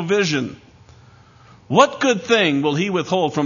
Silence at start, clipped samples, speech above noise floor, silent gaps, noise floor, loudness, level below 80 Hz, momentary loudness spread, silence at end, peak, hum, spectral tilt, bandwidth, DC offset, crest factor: 0 s; under 0.1%; 30 dB; none; -48 dBFS; -18 LUFS; -60 dBFS; 5 LU; 0 s; 0 dBFS; none; -4.5 dB/octave; 7.4 kHz; under 0.1%; 20 dB